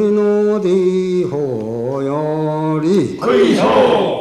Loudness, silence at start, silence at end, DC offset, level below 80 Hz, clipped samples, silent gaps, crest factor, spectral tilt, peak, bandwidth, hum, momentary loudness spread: -15 LUFS; 0 s; 0 s; under 0.1%; -52 dBFS; under 0.1%; none; 12 dB; -7 dB/octave; -2 dBFS; 11.5 kHz; none; 8 LU